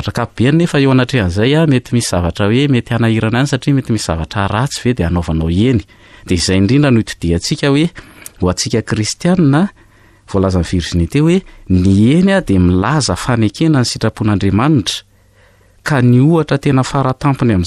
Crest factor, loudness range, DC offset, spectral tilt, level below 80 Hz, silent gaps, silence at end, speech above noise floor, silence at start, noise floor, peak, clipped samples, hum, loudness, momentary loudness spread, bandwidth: 10 dB; 3 LU; under 0.1%; -6 dB/octave; -34 dBFS; none; 0 s; 36 dB; 0 s; -48 dBFS; -2 dBFS; under 0.1%; none; -13 LUFS; 6 LU; 13 kHz